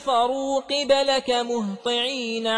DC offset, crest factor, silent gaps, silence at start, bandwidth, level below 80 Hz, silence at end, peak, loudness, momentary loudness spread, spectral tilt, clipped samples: under 0.1%; 16 dB; none; 0 s; 10.5 kHz; -60 dBFS; 0 s; -6 dBFS; -23 LUFS; 6 LU; -3 dB/octave; under 0.1%